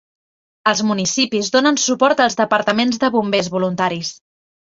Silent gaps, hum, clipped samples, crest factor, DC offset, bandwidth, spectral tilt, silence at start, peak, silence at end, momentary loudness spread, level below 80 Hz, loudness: none; none; under 0.1%; 16 dB; under 0.1%; 7.8 kHz; -3.5 dB/octave; 0.65 s; -2 dBFS; 0.65 s; 6 LU; -60 dBFS; -17 LUFS